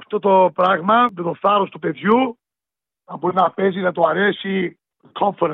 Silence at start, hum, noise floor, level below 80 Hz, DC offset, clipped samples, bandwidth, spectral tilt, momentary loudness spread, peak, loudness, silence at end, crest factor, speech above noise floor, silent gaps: 0.1 s; none; -89 dBFS; -70 dBFS; under 0.1%; under 0.1%; 4.3 kHz; -8.5 dB/octave; 9 LU; -4 dBFS; -18 LUFS; 0 s; 14 dB; 71 dB; none